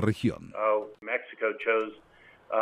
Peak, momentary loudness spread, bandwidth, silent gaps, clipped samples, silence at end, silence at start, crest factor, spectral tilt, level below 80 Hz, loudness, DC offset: -12 dBFS; 5 LU; 14 kHz; none; under 0.1%; 0 s; 0 s; 18 dB; -7 dB/octave; -62 dBFS; -30 LUFS; under 0.1%